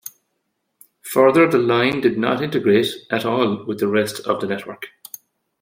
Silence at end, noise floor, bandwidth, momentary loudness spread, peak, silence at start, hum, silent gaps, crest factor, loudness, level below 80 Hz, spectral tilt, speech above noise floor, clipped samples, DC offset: 0.75 s; -73 dBFS; 16.5 kHz; 21 LU; -2 dBFS; 0.05 s; none; none; 18 dB; -18 LUFS; -62 dBFS; -5.5 dB/octave; 55 dB; under 0.1%; under 0.1%